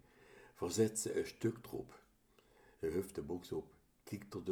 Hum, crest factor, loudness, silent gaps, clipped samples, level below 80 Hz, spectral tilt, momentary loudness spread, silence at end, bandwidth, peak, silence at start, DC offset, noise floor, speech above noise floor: none; 22 dB; -41 LUFS; none; under 0.1%; -68 dBFS; -5 dB/octave; 24 LU; 0 s; over 20 kHz; -20 dBFS; 0.2 s; under 0.1%; -71 dBFS; 30 dB